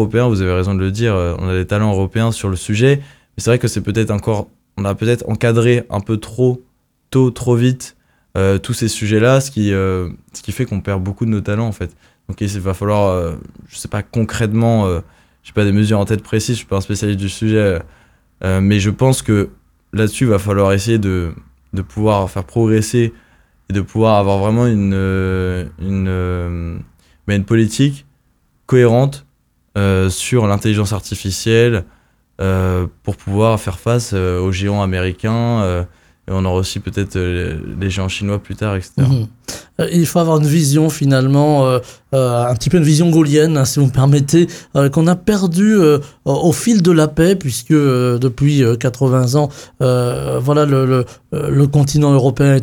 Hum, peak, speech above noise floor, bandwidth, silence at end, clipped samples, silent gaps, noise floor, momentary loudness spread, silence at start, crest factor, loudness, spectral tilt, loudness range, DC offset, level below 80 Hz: none; 0 dBFS; 44 dB; 17.5 kHz; 0 s; under 0.1%; none; -58 dBFS; 10 LU; 0 s; 14 dB; -15 LUFS; -6.5 dB/octave; 6 LU; under 0.1%; -38 dBFS